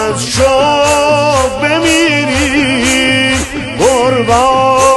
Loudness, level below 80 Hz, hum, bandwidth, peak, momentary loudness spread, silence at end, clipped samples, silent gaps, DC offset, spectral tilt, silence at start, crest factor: -10 LUFS; -30 dBFS; none; 12.5 kHz; 0 dBFS; 3 LU; 0 s; under 0.1%; none; under 0.1%; -3.5 dB/octave; 0 s; 10 dB